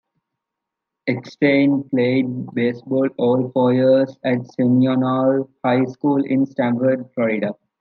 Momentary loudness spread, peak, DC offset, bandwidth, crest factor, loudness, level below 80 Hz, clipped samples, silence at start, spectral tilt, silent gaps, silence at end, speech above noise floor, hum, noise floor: 7 LU; -4 dBFS; under 0.1%; 6.2 kHz; 14 dB; -19 LUFS; -72 dBFS; under 0.1%; 1.05 s; -9 dB/octave; none; 0.25 s; 64 dB; none; -82 dBFS